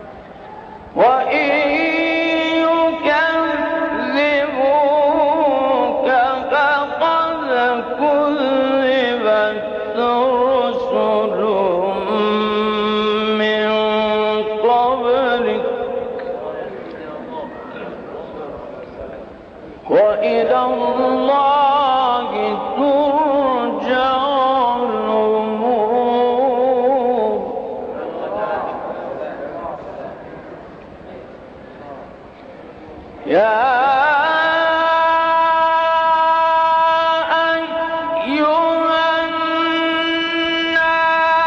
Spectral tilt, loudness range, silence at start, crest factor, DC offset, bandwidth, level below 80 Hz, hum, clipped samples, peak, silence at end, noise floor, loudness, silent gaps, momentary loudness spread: -5.5 dB/octave; 12 LU; 0 s; 14 dB; under 0.1%; 7 kHz; -52 dBFS; none; under 0.1%; -4 dBFS; 0 s; -37 dBFS; -16 LUFS; none; 17 LU